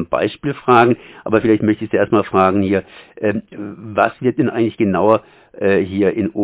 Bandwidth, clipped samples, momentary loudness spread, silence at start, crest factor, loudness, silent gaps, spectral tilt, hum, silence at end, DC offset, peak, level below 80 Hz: 4 kHz; under 0.1%; 8 LU; 0 s; 16 dB; -16 LUFS; none; -11 dB/octave; none; 0 s; under 0.1%; 0 dBFS; -46 dBFS